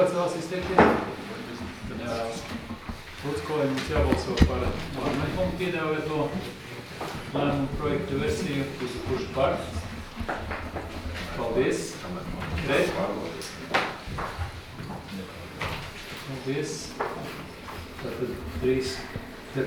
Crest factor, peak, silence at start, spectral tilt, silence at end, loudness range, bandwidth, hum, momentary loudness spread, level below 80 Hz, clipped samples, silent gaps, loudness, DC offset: 24 dB; -4 dBFS; 0 s; -5.5 dB/octave; 0 s; 6 LU; 19.5 kHz; none; 13 LU; -40 dBFS; under 0.1%; none; -29 LUFS; under 0.1%